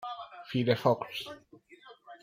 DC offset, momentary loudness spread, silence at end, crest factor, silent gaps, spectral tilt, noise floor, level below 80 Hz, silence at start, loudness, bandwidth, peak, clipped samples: under 0.1%; 21 LU; 0.05 s; 22 dB; none; -6.5 dB/octave; -56 dBFS; -72 dBFS; 0 s; -31 LUFS; 16 kHz; -10 dBFS; under 0.1%